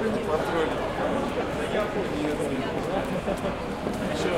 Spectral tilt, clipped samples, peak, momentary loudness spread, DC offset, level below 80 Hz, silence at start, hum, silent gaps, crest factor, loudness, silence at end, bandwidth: -5.5 dB/octave; under 0.1%; -12 dBFS; 3 LU; under 0.1%; -44 dBFS; 0 s; none; none; 14 dB; -28 LUFS; 0 s; 16.5 kHz